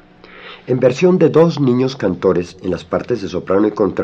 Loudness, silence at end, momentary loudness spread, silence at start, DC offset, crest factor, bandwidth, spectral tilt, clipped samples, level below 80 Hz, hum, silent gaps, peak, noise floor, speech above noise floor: -15 LUFS; 0 s; 11 LU; 0.35 s; under 0.1%; 14 dB; 8 kHz; -7.5 dB/octave; under 0.1%; -54 dBFS; none; none; 0 dBFS; -39 dBFS; 24 dB